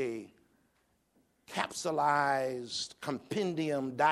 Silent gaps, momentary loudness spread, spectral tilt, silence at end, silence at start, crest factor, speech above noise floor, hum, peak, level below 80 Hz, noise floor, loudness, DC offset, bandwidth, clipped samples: none; 10 LU; -4 dB/octave; 0 s; 0 s; 20 dB; 41 dB; none; -14 dBFS; -76 dBFS; -74 dBFS; -33 LUFS; under 0.1%; 15 kHz; under 0.1%